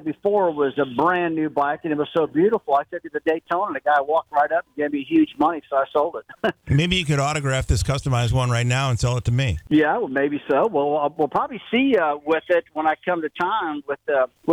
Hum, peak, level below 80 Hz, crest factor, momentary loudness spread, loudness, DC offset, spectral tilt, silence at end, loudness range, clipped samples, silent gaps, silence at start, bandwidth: none; -6 dBFS; -40 dBFS; 14 dB; 5 LU; -21 LUFS; under 0.1%; -6 dB/octave; 0 s; 1 LU; under 0.1%; none; 0 s; 13 kHz